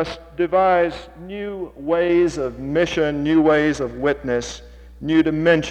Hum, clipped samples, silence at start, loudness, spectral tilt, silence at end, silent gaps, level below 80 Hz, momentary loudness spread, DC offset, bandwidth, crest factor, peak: none; under 0.1%; 0 s; -20 LUFS; -6 dB/octave; 0 s; none; -44 dBFS; 14 LU; under 0.1%; 9 kHz; 16 dB; -4 dBFS